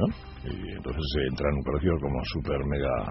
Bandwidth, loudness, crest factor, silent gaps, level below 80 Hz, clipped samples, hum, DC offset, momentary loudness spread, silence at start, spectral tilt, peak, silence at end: 6 kHz; -30 LUFS; 18 dB; none; -36 dBFS; under 0.1%; none; under 0.1%; 9 LU; 0 s; -6 dB/octave; -12 dBFS; 0 s